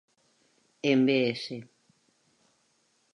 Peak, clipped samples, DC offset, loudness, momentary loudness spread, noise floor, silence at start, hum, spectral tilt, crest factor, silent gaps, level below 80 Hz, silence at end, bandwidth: -12 dBFS; under 0.1%; under 0.1%; -27 LUFS; 16 LU; -71 dBFS; 0.85 s; none; -6 dB/octave; 20 dB; none; -82 dBFS; 1.5 s; 10.5 kHz